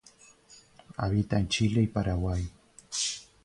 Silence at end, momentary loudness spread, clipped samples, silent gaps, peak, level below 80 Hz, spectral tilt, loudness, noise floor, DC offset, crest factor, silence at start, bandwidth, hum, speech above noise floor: 0.25 s; 9 LU; under 0.1%; none; -14 dBFS; -44 dBFS; -5 dB/octave; -29 LUFS; -57 dBFS; under 0.1%; 16 dB; 0.5 s; 11.5 kHz; none; 30 dB